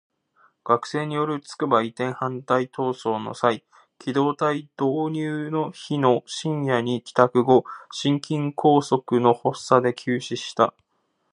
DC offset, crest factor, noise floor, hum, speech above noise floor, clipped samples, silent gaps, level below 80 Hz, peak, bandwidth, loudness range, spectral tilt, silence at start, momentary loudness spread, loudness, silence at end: under 0.1%; 22 dB; -72 dBFS; none; 49 dB; under 0.1%; none; -72 dBFS; -2 dBFS; 11 kHz; 4 LU; -6 dB/octave; 0.65 s; 8 LU; -23 LUFS; 0.6 s